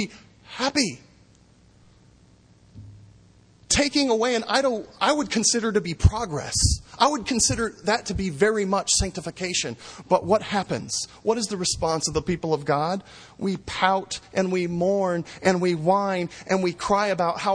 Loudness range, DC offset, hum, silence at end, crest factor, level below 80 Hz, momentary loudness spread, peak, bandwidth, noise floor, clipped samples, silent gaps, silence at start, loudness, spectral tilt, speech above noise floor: 4 LU; under 0.1%; none; 0 s; 22 dB; -40 dBFS; 8 LU; -2 dBFS; 10.5 kHz; -55 dBFS; under 0.1%; none; 0 s; -24 LUFS; -3.5 dB/octave; 32 dB